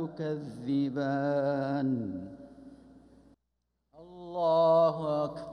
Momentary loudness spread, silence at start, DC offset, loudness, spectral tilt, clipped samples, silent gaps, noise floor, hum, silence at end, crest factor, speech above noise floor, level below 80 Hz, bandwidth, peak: 19 LU; 0 s; under 0.1%; -29 LUFS; -8.5 dB/octave; under 0.1%; none; -81 dBFS; none; 0 s; 16 dB; 52 dB; -68 dBFS; 9.8 kHz; -16 dBFS